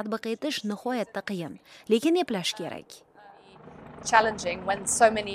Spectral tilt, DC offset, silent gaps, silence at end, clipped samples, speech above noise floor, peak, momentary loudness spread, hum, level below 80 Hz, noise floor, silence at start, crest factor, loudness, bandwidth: -3 dB/octave; under 0.1%; none; 0 s; under 0.1%; 25 dB; -4 dBFS; 18 LU; none; -60 dBFS; -52 dBFS; 0 s; 24 dB; -27 LUFS; 15.5 kHz